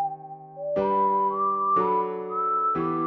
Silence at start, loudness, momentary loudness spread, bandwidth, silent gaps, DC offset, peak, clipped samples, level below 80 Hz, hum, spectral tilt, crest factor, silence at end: 0 s; -24 LUFS; 11 LU; 5 kHz; none; under 0.1%; -12 dBFS; under 0.1%; -62 dBFS; none; -9.5 dB/octave; 12 dB; 0 s